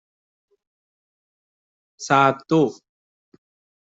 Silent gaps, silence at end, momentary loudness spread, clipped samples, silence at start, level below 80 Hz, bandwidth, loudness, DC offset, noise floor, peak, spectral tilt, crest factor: none; 1.15 s; 8 LU; under 0.1%; 2 s; -68 dBFS; 8 kHz; -19 LUFS; under 0.1%; under -90 dBFS; -4 dBFS; -5.5 dB/octave; 22 dB